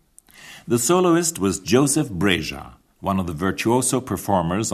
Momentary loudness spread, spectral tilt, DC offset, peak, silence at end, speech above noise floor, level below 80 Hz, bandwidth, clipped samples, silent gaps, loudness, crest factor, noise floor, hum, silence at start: 9 LU; -4.5 dB/octave; under 0.1%; -4 dBFS; 0 s; 27 dB; -48 dBFS; 14 kHz; under 0.1%; none; -20 LUFS; 18 dB; -47 dBFS; none; 0.4 s